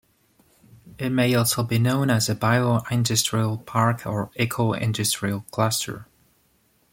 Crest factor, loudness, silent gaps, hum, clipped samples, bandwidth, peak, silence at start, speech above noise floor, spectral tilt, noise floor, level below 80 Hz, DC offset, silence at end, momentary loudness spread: 18 dB; -23 LUFS; none; none; under 0.1%; 17 kHz; -6 dBFS; 0.85 s; 42 dB; -4.5 dB/octave; -64 dBFS; -56 dBFS; under 0.1%; 0.9 s; 7 LU